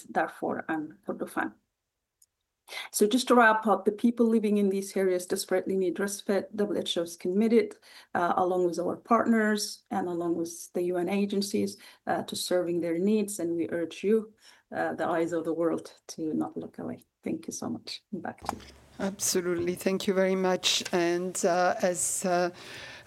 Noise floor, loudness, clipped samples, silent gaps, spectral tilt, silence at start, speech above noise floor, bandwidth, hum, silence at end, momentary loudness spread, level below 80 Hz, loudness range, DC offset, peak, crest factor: -84 dBFS; -28 LUFS; under 0.1%; none; -4 dB/octave; 0 s; 56 dB; 16.5 kHz; none; 0.05 s; 12 LU; -68 dBFS; 7 LU; under 0.1%; -8 dBFS; 20 dB